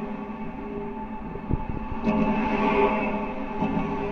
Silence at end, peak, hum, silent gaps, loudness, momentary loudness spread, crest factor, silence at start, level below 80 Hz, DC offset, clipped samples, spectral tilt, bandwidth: 0 s; -10 dBFS; none; none; -27 LUFS; 12 LU; 16 dB; 0 s; -38 dBFS; under 0.1%; under 0.1%; -8.5 dB/octave; 6.6 kHz